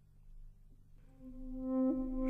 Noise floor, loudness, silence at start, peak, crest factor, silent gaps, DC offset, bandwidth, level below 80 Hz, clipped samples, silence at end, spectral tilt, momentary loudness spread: -59 dBFS; -37 LUFS; 0.15 s; -26 dBFS; 14 dB; none; under 0.1%; 2.4 kHz; -50 dBFS; under 0.1%; 0 s; -10.5 dB/octave; 21 LU